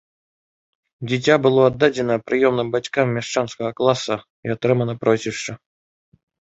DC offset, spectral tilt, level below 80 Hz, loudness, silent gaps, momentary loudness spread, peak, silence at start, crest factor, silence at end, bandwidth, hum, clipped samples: under 0.1%; -5.5 dB/octave; -58 dBFS; -20 LUFS; 4.30-4.43 s; 11 LU; 0 dBFS; 1 s; 20 dB; 0.95 s; 8 kHz; none; under 0.1%